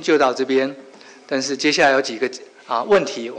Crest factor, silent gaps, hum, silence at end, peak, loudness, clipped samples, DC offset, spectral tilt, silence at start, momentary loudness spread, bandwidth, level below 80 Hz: 14 dB; none; none; 0 s; -6 dBFS; -19 LUFS; under 0.1%; under 0.1%; -3 dB/octave; 0 s; 11 LU; 9.6 kHz; -64 dBFS